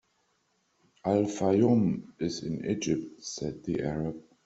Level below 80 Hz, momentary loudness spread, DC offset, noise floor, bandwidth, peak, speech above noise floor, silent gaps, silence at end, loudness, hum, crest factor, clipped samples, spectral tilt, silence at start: -60 dBFS; 12 LU; under 0.1%; -73 dBFS; 8.2 kHz; -12 dBFS; 44 dB; none; 0.25 s; -30 LUFS; none; 18 dB; under 0.1%; -6.5 dB/octave; 1.05 s